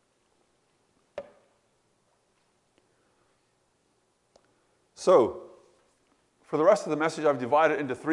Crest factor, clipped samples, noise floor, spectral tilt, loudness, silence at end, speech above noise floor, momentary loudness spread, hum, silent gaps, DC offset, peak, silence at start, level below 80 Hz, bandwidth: 22 dB; under 0.1%; -71 dBFS; -5.5 dB/octave; -25 LUFS; 0 s; 47 dB; 23 LU; none; none; under 0.1%; -8 dBFS; 1.15 s; -76 dBFS; 11.5 kHz